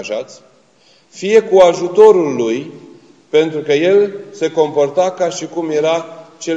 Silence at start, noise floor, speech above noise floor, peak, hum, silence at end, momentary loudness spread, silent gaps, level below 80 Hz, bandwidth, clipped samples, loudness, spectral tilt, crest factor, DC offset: 0 s; -51 dBFS; 38 dB; 0 dBFS; none; 0 s; 16 LU; none; -60 dBFS; 8 kHz; 0.1%; -14 LUFS; -5 dB/octave; 14 dB; under 0.1%